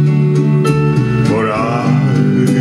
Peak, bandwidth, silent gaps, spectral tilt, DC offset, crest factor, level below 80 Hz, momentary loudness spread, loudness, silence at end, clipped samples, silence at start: 0 dBFS; 12 kHz; none; -8 dB/octave; under 0.1%; 12 dB; -40 dBFS; 2 LU; -13 LUFS; 0 s; under 0.1%; 0 s